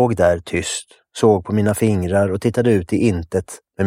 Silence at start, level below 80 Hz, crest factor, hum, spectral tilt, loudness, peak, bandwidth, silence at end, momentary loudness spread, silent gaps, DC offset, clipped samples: 0 s; -44 dBFS; 16 dB; none; -6 dB/octave; -18 LUFS; -2 dBFS; 16.5 kHz; 0 s; 9 LU; none; under 0.1%; under 0.1%